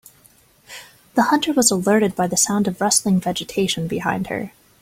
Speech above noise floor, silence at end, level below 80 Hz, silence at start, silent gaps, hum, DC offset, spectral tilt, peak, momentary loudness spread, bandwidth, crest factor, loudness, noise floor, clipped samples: 35 dB; 0.35 s; -56 dBFS; 0.7 s; none; none; under 0.1%; -3.5 dB/octave; -2 dBFS; 19 LU; 16.5 kHz; 18 dB; -19 LUFS; -54 dBFS; under 0.1%